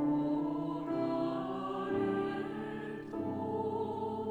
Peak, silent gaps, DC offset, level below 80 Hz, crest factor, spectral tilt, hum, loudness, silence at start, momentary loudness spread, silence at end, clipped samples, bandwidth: -22 dBFS; none; under 0.1%; -66 dBFS; 12 dB; -8.5 dB/octave; none; -36 LUFS; 0 s; 7 LU; 0 s; under 0.1%; 8.2 kHz